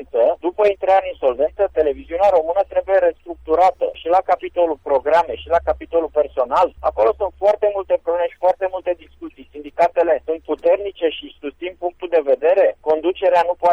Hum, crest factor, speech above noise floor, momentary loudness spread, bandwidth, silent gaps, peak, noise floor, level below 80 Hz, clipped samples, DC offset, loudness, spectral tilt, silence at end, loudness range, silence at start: none; 12 dB; 20 dB; 10 LU; 7.6 kHz; none; -6 dBFS; -37 dBFS; -46 dBFS; under 0.1%; under 0.1%; -18 LUFS; -6 dB/octave; 0 s; 3 LU; 0 s